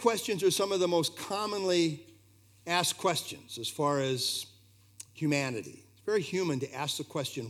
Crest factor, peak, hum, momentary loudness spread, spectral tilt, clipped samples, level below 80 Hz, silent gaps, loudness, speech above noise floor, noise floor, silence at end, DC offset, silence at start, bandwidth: 22 dB; -10 dBFS; 60 Hz at -65 dBFS; 13 LU; -4 dB/octave; under 0.1%; -78 dBFS; none; -31 LUFS; 30 dB; -61 dBFS; 0 s; under 0.1%; 0 s; 17.5 kHz